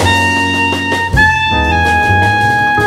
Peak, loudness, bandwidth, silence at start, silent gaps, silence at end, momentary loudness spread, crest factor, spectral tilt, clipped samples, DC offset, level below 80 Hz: 0 dBFS; -10 LUFS; 16 kHz; 0 s; none; 0 s; 3 LU; 12 dB; -4.5 dB/octave; under 0.1%; under 0.1%; -26 dBFS